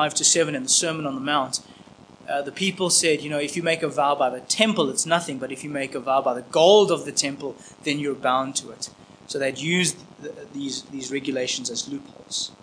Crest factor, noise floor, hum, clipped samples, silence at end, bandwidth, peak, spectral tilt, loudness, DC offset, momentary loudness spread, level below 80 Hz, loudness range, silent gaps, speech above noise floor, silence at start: 22 dB; -48 dBFS; none; under 0.1%; 0.1 s; 10.5 kHz; -2 dBFS; -2.5 dB/octave; -23 LUFS; under 0.1%; 15 LU; -68 dBFS; 6 LU; none; 24 dB; 0 s